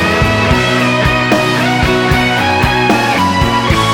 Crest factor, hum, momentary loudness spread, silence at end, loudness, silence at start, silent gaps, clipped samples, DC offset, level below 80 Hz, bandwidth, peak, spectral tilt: 12 dB; none; 1 LU; 0 s; -11 LUFS; 0 s; none; under 0.1%; under 0.1%; -24 dBFS; 17 kHz; 0 dBFS; -5 dB/octave